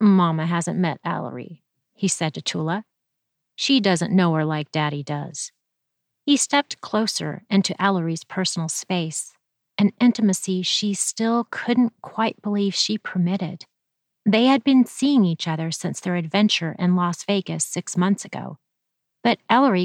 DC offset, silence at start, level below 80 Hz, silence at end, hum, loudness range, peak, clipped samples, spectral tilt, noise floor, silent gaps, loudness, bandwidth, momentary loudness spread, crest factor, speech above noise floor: under 0.1%; 0 s; -74 dBFS; 0 s; none; 3 LU; -4 dBFS; under 0.1%; -4.5 dB/octave; -79 dBFS; none; -22 LUFS; 13 kHz; 11 LU; 18 dB; 58 dB